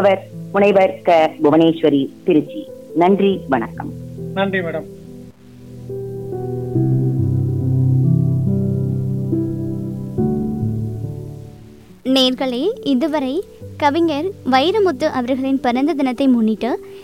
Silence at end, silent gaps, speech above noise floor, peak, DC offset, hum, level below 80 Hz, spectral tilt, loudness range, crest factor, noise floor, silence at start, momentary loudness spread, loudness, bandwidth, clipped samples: 0 s; none; 25 dB; -4 dBFS; 0.3%; none; -48 dBFS; -7.5 dB/octave; 7 LU; 14 dB; -41 dBFS; 0 s; 15 LU; -18 LUFS; 13 kHz; under 0.1%